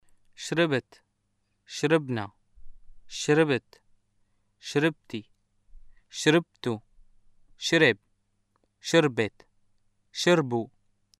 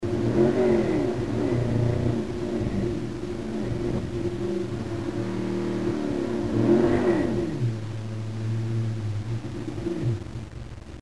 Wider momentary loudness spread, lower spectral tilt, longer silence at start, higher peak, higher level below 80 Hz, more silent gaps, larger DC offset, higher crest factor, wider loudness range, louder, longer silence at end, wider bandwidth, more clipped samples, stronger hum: first, 17 LU vs 11 LU; second, -4.5 dB/octave vs -8 dB/octave; first, 0.4 s vs 0 s; about the same, -6 dBFS vs -8 dBFS; second, -60 dBFS vs -44 dBFS; neither; second, under 0.1% vs 0.7%; about the same, 22 dB vs 18 dB; about the same, 4 LU vs 4 LU; about the same, -26 LUFS vs -26 LUFS; first, 0.55 s vs 0 s; first, 13.5 kHz vs 11.5 kHz; neither; neither